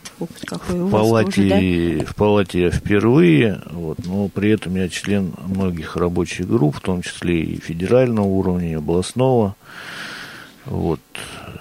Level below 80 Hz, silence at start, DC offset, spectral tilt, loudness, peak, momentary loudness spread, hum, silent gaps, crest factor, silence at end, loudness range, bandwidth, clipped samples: -42 dBFS; 0.05 s; under 0.1%; -6.5 dB/octave; -19 LUFS; -4 dBFS; 15 LU; none; none; 16 dB; 0 s; 5 LU; 16 kHz; under 0.1%